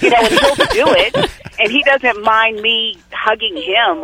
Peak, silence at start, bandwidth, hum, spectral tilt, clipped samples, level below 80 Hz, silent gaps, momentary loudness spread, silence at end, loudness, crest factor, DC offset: 0 dBFS; 0 s; 16.5 kHz; none; -3 dB/octave; under 0.1%; -40 dBFS; none; 7 LU; 0 s; -13 LUFS; 14 dB; under 0.1%